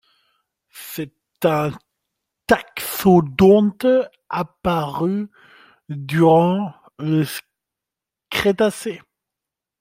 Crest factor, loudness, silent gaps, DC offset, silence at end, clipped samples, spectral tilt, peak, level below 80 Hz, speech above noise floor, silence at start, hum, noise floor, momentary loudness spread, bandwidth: 18 dB; -19 LUFS; none; under 0.1%; 0.85 s; under 0.1%; -6.5 dB/octave; -2 dBFS; -52 dBFS; 69 dB; 0.75 s; none; -86 dBFS; 19 LU; 16 kHz